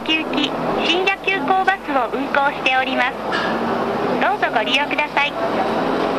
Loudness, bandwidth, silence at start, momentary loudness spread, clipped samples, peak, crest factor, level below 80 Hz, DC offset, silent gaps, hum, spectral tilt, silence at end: -18 LUFS; 14 kHz; 0 s; 4 LU; under 0.1%; -2 dBFS; 16 dB; -50 dBFS; under 0.1%; none; none; -4 dB/octave; 0 s